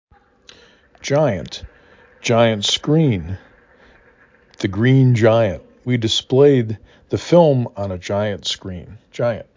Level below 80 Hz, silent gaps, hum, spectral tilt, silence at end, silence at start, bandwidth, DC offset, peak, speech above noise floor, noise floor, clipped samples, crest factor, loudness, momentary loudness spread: -44 dBFS; none; none; -6 dB/octave; 0.15 s; 1.05 s; 7.6 kHz; under 0.1%; -2 dBFS; 35 dB; -52 dBFS; under 0.1%; 18 dB; -17 LUFS; 19 LU